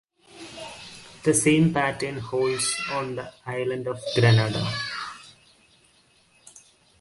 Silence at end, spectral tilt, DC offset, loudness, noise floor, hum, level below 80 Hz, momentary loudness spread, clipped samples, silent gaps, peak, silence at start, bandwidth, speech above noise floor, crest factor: 0.4 s; -4.5 dB/octave; under 0.1%; -24 LUFS; -60 dBFS; none; -58 dBFS; 20 LU; under 0.1%; none; -8 dBFS; 0.35 s; 11.5 kHz; 37 dB; 18 dB